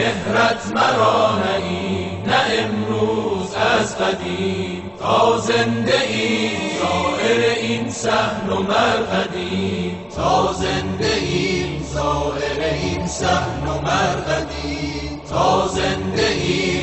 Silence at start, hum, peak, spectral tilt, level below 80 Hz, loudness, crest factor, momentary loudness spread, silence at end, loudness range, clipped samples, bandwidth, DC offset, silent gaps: 0 s; none; -4 dBFS; -4.5 dB/octave; -38 dBFS; -19 LUFS; 16 dB; 6 LU; 0 s; 2 LU; under 0.1%; 8.6 kHz; under 0.1%; none